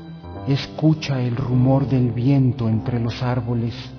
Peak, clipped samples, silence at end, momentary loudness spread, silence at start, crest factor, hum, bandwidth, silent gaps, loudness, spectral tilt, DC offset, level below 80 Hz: -6 dBFS; under 0.1%; 0 s; 6 LU; 0 s; 14 dB; none; 5.4 kHz; none; -20 LUFS; -8.5 dB/octave; under 0.1%; -44 dBFS